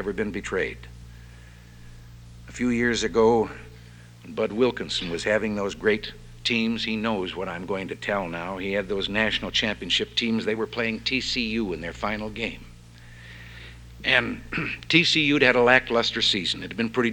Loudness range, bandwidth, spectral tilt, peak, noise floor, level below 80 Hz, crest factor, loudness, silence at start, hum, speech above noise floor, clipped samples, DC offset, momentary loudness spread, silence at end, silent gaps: 7 LU; 17.5 kHz; -4 dB/octave; -4 dBFS; -46 dBFS; -48 dBFS; 22 dB; -24 LUFS; 0 s; none; 21 dB; under 0.1%; under 0.1%; 13 LU; 0 s; none